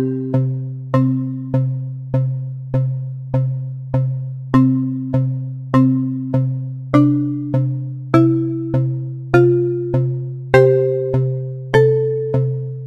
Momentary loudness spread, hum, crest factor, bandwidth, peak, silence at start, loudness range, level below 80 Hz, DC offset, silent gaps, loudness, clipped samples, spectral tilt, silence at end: 8 LU; none; 16 dB; 6 kHz; 0 dBFS; 0 s; 5 LU; -44 dBFS; under 0.1%; none; -18 LUFS; under 0.1%; -10 dB/octave; 0 s